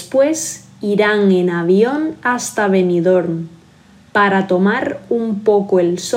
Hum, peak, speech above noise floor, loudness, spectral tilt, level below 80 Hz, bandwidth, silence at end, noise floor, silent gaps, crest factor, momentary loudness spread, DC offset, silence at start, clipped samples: none; -2 dBFS; 31 dB; -15 LUFS; -5.5 dB/octave; -60 dBFS; 16 kHz; 0 s; -46 dBFS; none; 14 dB; 7 LU; under 0.1%; 0 s; under 0.1%